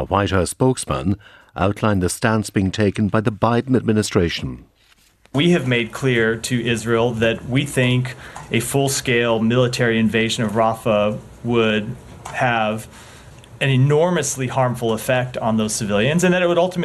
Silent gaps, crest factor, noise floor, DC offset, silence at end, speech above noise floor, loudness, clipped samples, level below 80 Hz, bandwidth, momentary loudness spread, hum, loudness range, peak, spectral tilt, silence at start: none; 18 dB; -55 dBFS; under 0.1%; 0 s; 37 dB; -19 LUFS; under 0.1%; -44 dBFS; 13.5 kHz; 7 LU; none; 2 LU; 0 dBFS; -5 dB/octave; 0 s